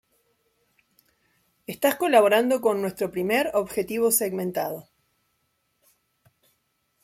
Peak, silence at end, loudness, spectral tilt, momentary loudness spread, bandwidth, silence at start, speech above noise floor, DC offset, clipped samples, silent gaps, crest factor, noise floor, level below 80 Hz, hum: -4 dBFS; 2.25 s; -23 LUFS; -3.5 dB/octave; 13 LU; 16.5 kHz; 1.7 s; 50 dB; under 0.1%; under 0.1%; none; 22 dB; -73 dBFS; -66 dBFS; none